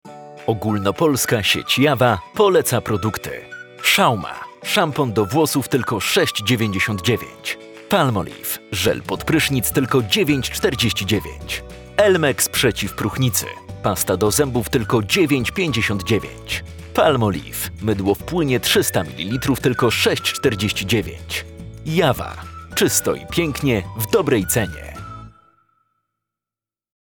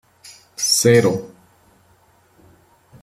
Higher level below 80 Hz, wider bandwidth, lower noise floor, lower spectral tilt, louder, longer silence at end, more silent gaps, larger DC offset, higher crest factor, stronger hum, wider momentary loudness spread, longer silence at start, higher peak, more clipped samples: first, -42 dBFS vs -58 dBFS; first, over 20 kHz vs 15.5 kHz; first, -90 dBFS vs -56 dBFS; about the same, -4 dB/octave vs -3.5 dB/octave; second, -19 LUFS vs -16 LUFS; about the same, 1.7 s vs 1.75 s; neither; neither; about the same, 20 dB vs 20 dB; neither; second, 11 LU vs 16 LU; second, 0.05 s vs 0.6 s; about the same, 0 dBFS vs -2 dBFS; neither